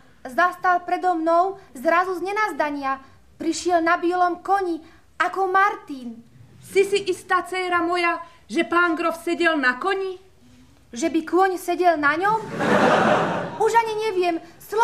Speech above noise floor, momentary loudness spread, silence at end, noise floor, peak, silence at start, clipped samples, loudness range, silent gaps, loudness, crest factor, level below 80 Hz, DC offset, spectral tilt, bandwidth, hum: 31 dB; 10 LU; 0 s; -52 dBFS; -4 dBFS; 0.25 s; under 0.1%; 3 LU; none; -21 LUFS; 18 dB; -62 dBFS; 0.2%; -4.5 dB/octave; 15 kHz; none